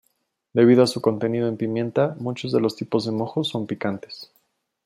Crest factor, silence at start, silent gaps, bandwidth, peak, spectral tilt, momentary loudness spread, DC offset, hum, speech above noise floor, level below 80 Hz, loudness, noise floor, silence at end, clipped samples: 18 dB; 0.55 s; none; 13.5 kHz; -4 dBFS; -6.5 dB/octave; 12 LU; under 0.1%; none; 50 dB; -68 dBFS; -22 LUFS; -71 dBFS; 0.6 s; under 0.1%